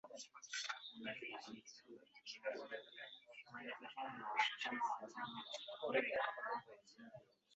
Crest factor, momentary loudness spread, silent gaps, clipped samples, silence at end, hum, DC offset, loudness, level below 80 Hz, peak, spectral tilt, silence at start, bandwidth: 24 dB; 21 LU; none; under 0.1%; 0 s; none; under 0.1%; -45 LUFS; under -90 dBFS; -22 dBFS; 0 dB/octave; 0.05 s; 8 kHz